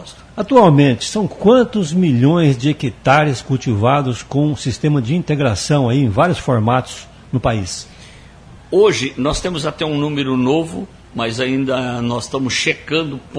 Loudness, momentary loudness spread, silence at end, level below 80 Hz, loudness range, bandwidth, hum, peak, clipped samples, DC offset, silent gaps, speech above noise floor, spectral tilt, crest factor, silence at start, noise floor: -16 LUFS; 10 LU; 0 s; -40 dBFS; 5 LU; 10.5 kHz; none; 0 dBFS; under 0.1%; under 0.1%; none; 25 dB; -6 dB/octave; 16 dB; 0 s; -40 dBFS